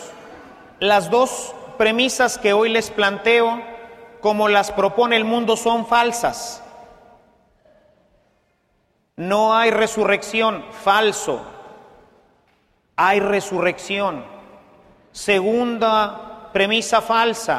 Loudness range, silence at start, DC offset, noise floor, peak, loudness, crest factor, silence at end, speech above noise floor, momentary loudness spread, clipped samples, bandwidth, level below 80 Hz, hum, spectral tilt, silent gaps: 5 LU; 0 s; under 0.1%; -65 dBFS; -2 dBFS; -18 LUFS; 18 dB; 0 s; 47 dB; 14 LU; under 0.1%; 15 kHz; -56 dBFS; none; -3 dB/octave; none